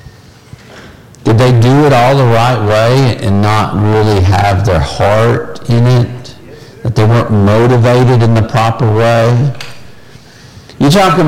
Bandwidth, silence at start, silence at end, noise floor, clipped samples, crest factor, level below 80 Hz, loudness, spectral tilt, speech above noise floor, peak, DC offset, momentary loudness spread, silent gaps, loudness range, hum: 14.5 kHz; 0.7 s; 0 s; -36 dBFS; under 0.1%; 8 dB; -32 dBFS; -9 LUFS; -7 dB/octave; 28 dB; -2 dBFS; under 0.1%; 7 LU; none; 2 LU; none